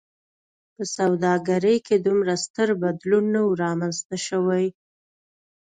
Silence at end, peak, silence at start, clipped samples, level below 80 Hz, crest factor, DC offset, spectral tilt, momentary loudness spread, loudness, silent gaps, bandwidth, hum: 1.05 s; -8 dBFS; 0.8 s; under 0.1%; -68 dBFS; 14 dB; under 0.1%; -5.5 dB/octave; 7 LU; -23 LUFS; 2.50-2.54 s, 4.05-4.10 s; 9.6 kHz; none